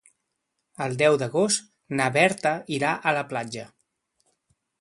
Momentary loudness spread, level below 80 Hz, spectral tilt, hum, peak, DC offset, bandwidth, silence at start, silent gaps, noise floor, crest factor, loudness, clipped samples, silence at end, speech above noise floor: 11 LU; -68 dBFS; -4 dB/octave; none; -4 dBFS; under 0.1%; 11.5 kHz; 0.8 s; none; -79 dBFS; 22 dB; -24 LUFS; under 0.1%; 1.15 s; 55 dB